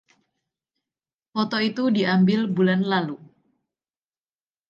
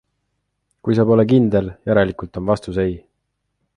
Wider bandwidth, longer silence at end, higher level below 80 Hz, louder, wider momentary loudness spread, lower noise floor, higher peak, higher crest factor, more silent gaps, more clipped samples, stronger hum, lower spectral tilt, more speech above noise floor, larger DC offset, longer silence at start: second, 7 kHz vs 10.5 kHz; first, 1.55 s vs 0.8 s; second, -72 dBFS vs -44 dBFS; second, -22 LUFS vs -18 LUFS; about the same, 12 LU vs 11 LU; first, under -90 dBFS vs -73 dBFS; second, -10 dBFS vs -2 dBFS; about the same, 16 dB vs 16 dB; neither; neither; second, none vs 50 Hz at -40 dBFS; about the same, -7.5 dB/octave vs -8.5 dB/octave; first, over 69 dB vs 57 dB; neither; first, 1.35 s vs 0.85 s